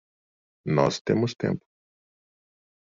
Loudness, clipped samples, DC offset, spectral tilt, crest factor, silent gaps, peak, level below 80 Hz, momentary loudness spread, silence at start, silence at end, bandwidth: -26 LUFS; under 0.1%; under 0.1%; -6 dB/octave; 22 dB; 1.01-1.05 s; -6 dBFS; -64 dBFS; 10 LU; 0.65 s; 1.35 s; 7.6 kHz